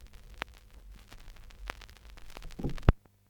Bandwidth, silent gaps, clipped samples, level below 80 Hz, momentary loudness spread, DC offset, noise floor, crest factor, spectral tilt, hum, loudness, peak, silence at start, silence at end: 18.5 kHz; none; under 0.1%; -38 dBFS; 25 LU; under 0.1%; -52 dBFS; 34 dB; -7 dB/octave; none; -36 LUFS; -2 dBFS; 0 s; 0.3 s